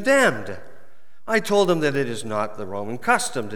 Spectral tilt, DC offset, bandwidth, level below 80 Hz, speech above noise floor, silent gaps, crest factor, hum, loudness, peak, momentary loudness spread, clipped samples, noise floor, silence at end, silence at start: -4 dB/octave; 3%; 18.5 kHz; -68 dBFS; 35 dB; none; 20 dB; none; -22 LUFS; -4 dBFS; 15 LU; under 0.1%; -57 dBFS; 0 s; 0 s